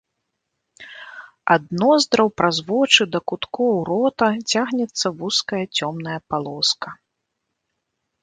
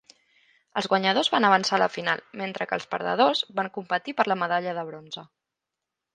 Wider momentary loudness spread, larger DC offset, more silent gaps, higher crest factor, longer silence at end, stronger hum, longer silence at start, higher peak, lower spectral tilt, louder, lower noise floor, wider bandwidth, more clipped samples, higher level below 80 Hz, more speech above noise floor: about the same, 14 LU vs 13 LU; neither; neither; about the same, 22 dB vs 22 dB; first, 1.3 s vs 0.9 s; neither; about the same, 0.8 s vs 0.75 s; first, 0 dBFS vs -4 dBFS; about the same, -3.5 dB/octave vs -4 dB/octave; first, -20 LUFS vs -25 LUFS; second, -77 dBFS vs -86 dBFS; about the same, 9.6 kHz vs 9.6 kHz; neither; first, -62 dBFS vs -76 dBFS; second, 57 dB vs 61 dB